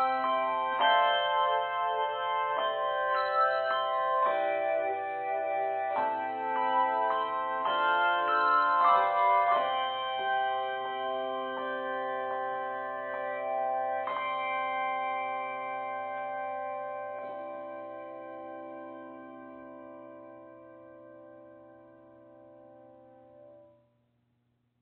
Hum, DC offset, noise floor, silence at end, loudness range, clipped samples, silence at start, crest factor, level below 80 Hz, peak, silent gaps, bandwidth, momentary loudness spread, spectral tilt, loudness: none; under 0.1%; -75 dBFS; 1.2 s; 18 LU; under 0.1%; 0 s; 18 dB; -82 dBFS; -12 dBFS; none; 4.5 kHz; 18 LU; 1 dB/octave; -30 LUFS